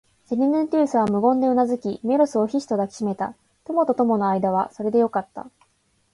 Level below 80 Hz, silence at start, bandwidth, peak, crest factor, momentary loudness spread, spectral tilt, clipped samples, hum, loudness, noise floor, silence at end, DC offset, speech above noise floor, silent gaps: -64 dBFS; 0.3 s; 11.5 kHz; -8 dBFS; 14 dB; 9 LU; -7.5 dB/octave; under 0.1%; none; -22 LUFS; -66 dBFS; 0.65 s; under 0.1%; 45 dB; none